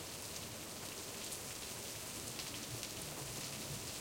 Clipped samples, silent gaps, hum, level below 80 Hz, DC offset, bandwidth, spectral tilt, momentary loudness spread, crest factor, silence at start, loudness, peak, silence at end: under 0.1%; none; none; -66 dBFS; under 0.1%; 17 kHz; -2 dB/octave; 2 LU; 24 dB; 0 s; -44 LUFS; -22 dBFS; 0 s